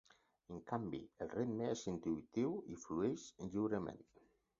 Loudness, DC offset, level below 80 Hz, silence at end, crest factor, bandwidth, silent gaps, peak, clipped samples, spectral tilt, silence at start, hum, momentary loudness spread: -43 LUFS; under 0.1%; -70 dBFS; 0.55 s; 18 dB; 7.4 kHz; none; -24 dBFS; under 0.1%; -7 dB/octave; 0.5 s; none; 8 LU